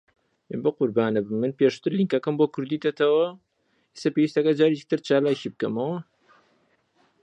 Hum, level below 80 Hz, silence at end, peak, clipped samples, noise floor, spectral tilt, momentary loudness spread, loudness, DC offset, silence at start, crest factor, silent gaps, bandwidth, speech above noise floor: none; -74 dBFS; 1.2 s; -8 dBFS; under 0.1%; -68 dBFS; -7 dB/octave; 7 LU; -24 LUFS; under 0.1%; 0.5 s; 18 dB; none; 8.8 kHz; 45 dB